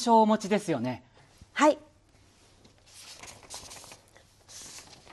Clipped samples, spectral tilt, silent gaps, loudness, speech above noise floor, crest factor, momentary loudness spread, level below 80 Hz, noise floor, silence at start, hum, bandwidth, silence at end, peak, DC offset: under 0.1%; -4.5 dB/octave; none; -26 LUFS; 36 dB; 20 dB; 23 LU; -66 dBFS; -61 dBFS; 0 s; none; 12.5 kHz; 0.3 s; -10 dBFS; under 0.1%